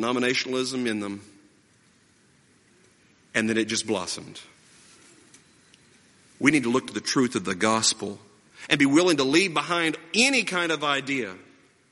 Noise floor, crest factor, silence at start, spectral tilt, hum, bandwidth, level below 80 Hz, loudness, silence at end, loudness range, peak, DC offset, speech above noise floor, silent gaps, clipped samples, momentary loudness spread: -61 dBFS; 24 dB; 0 s; -3 dB/octave; none; 11.5 kHz; -68 dBFS; -24 LUFS; 0.55 s; 8 LU; -2 dBFS; under 0.1%; 36 dB; none; under 0.1%; 15 LU